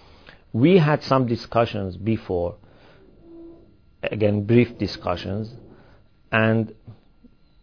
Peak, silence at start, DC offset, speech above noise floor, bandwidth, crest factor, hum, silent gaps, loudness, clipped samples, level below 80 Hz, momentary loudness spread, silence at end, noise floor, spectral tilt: -4 dBFS; 0.55 s; 0.2%; 34 dB; 5.4 kHz; 20 dB; none; none; -22 LUFS; under 0.1%; -52 dBFS; 13 LU; 0.7 s; -55 dBFS; -8.5 dB/octave